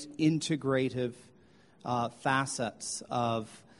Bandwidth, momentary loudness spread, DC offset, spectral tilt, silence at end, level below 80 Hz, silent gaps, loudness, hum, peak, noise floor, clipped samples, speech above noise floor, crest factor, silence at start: 11.5 kHz; 8 LU; under 0.1%; -5 dB/octave; 0.2 s; -68 dBFS; none; -32 LUFS; none; -14 dBFS; -61 dBFS; under 0.1%; 29 dB; 20 dB; 0 s